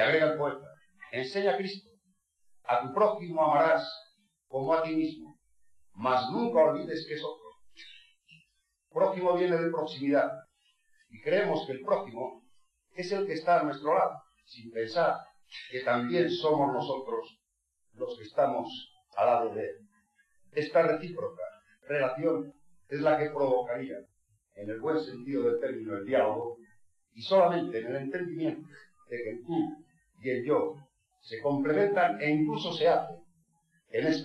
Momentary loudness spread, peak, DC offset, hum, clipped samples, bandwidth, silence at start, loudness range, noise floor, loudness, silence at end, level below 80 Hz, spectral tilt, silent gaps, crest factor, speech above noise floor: 16 LU; -12 dBFS; under 0.1%; none; under 0.1%; 10.5 kHz; 0 s; 3 LU; -78 dBFS; -30 LUFS; 0 s; -76 dBFS; -6.5 dB/octave; none; 18 dB; 49 dB